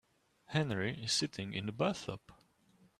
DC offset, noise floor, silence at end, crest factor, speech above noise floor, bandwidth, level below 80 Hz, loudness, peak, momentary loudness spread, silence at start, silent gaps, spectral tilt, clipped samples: under 0.1%; -69 dBFS; 0.65 s; 20 dB; 32 dB; 14 kHz; -68 dBFS; -36 LUFS; -18 dBFS; 9 LU; 0.5 s; none; -4 dB/octave; under 0.1%